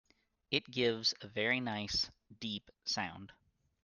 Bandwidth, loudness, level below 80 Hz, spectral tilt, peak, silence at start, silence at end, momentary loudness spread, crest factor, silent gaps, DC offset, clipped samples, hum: 11 kHz; -36 LUFS; -66 dBFS; -3.5 dB/octave; -16 dBFS; 0.5 s; 0.5 s; 10 LU; 24 dB; none; under 0.1%; under 0.1%; none